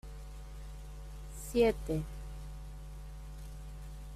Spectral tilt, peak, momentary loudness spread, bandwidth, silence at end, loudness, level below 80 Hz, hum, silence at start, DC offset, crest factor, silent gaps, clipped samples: -6 dB/octave; -16 dBFS; 19 LU; 15 kHz; 0 s; -37 LUFS; -44 dBFS; none; 0.05 s; under 0.1%; 22 dB; none; under 0.1%